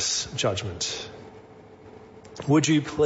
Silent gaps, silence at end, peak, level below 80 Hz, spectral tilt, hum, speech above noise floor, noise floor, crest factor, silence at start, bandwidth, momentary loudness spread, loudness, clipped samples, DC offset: none; 0 s; -10 dBFS; -56 dBFS; -4 dB/octave; none; 23 dB; -48 dBFS; 18 dB; 0 s; 8 kHz; 26 LU; -25 LUFS; under 0.1%; under 0.1%